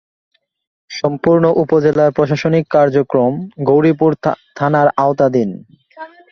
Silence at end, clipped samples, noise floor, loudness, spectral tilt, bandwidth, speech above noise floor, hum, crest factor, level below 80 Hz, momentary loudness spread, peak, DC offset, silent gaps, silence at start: 0.25 s; under 0.1%; -36 dBFS; -14 LUFS; -8 dB/octave; 6.8 kHz; 22 dB; none; 14 dB; -54 dBFS; 10 LU; 0 dBFS; under 0.1%; none; 0.9 s